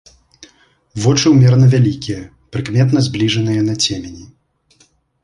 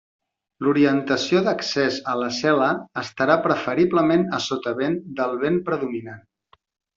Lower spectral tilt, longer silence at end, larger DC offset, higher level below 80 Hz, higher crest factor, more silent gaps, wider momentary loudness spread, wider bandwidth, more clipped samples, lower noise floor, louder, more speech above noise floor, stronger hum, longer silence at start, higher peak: about the same, -6 dB/octave vs -5.5 dB/octave; first, 1 s vs 0.8 s; neither; first, -44 dBFS vs -62 dBFS; second, 14 dB vs 20 dB; neither; first, 17 LU vs 7 LU; first, 10.5 kHz vs 7.6 kHz; neither; second, -55 dBFS vs -61 dBFS; first, -14 LUFS vs -21 LUFS; about the same, 42 dB vs 40 dB; neither; first, 0.95 s vs 0.6 s; about the same, -2 dBFS vs -2 dBFS